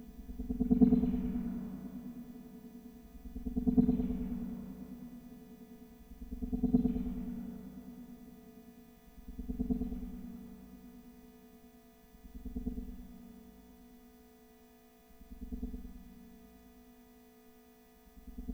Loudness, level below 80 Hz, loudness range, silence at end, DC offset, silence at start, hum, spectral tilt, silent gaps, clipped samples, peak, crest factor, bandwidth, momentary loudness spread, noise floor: -36 LUFS; -48 dBFS; 17 LU; 0 s; under 0.1%; 0 s; none; -9.5 dB/octave; none; under 0.1%; -12 dBFS; 26 dB; 17.5 kHz; 27 LU; -61 dBFS